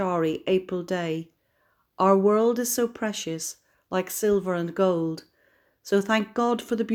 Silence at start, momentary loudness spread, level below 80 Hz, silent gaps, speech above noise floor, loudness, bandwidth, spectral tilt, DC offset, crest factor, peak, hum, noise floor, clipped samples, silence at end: 0 s; 11 LU; -64 dBFS; none; 44 dB; -25 LUFS; 19.5 kHz; -5 dB/octave; under 0.1%; 18 dB; -6 dBFS; none; -69 dBFS; under 0.1%; 0 s